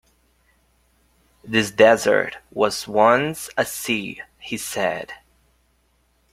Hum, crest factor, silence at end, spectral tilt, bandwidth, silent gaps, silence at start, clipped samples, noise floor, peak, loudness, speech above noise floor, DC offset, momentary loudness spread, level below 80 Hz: none; 20 dB; 1.15 s; -3.5 dB/octave; 16 kHz; none; 1.45 s; under 0.1%; -64 dBFS; -2 dBFS; -20 LUFS; 44 dB; under 0.1%; 17 LU; -58 dBFS